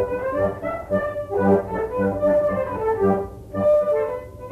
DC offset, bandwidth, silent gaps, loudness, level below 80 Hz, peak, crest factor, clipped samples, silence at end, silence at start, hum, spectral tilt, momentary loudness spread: under 0.1%; 13.5 kHz; none; -22 LUFS; -44 dBFS; -6 dBFS; 16 dB; under 0.1%; 0 s; 0 s; none; -9 dB/octave; 7 LU